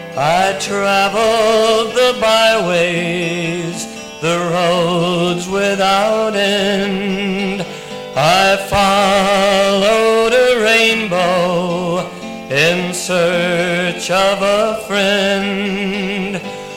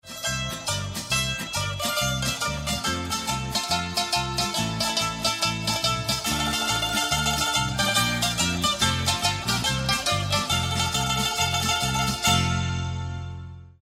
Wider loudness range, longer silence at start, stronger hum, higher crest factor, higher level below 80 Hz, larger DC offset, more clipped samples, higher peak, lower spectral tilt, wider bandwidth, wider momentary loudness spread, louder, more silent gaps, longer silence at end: about the same, 4 LU vs 3 LU; about the same, 0 s vs 0.05 s; neither; about the same, 14 dB vs 18 dB; about the same, -44 dBFS vs -42 dBFS; neither; neither; first, 0 dBFS vs -8 dBFS; first, -4 dB/octave vs -2.5 dB/octave; about the same, 16.5 kHz vs 16 kHz; about the same, 8 LU vs 6 LU; first, -14 LUFS vs -24 LUFS; neither; about the same, 0 s vs 0.1 s